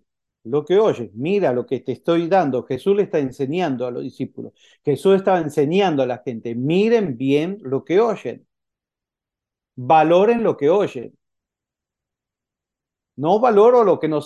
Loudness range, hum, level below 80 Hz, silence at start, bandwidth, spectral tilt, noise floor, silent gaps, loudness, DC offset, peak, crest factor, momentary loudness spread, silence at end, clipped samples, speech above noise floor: 2 LU; none; -66 dBFS; 0.45 s; 12 kHz; -7.5 dB/octave; -88 dBFS; none; -19 LUFS; under 0.1%; -4 dBFS; 16 dB; 14 LU; 0 s; under 0.1%; 69 dB